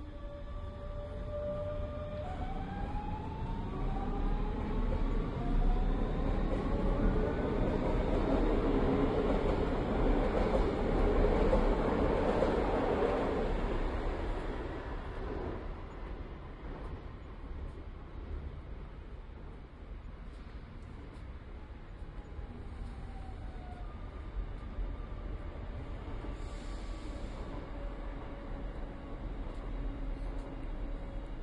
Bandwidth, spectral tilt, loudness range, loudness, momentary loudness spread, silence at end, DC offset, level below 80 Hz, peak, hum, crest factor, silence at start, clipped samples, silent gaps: 7.8 kHz; -8 dB/octave; 16 LU; -36 LUFS; 17 LU; 0 s; under 0.1%; -38 dBFS; -16 dBFS; none; 18 dB; 0 s; under 0.1%; none